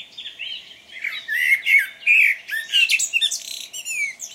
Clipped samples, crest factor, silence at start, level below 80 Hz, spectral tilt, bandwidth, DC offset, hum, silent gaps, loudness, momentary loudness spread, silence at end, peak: under 0.1%; 16 dB; 0 s; -74 dBFS; 4.5 dB/octave; 16.5 kHz; under 0.1%; none; none; -17 LUFS; 17 LU; 0 s; -6 dBFS